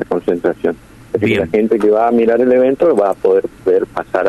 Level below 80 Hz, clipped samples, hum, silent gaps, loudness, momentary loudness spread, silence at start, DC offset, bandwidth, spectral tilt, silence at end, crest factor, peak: -46 dBFS; under 0.1%; none; none; -14 LUFS; 8 LU; 0 s; under 0.1%; 12 kHz; -7.5 dB/octave; 0 s; 10 dB; -4 dBFS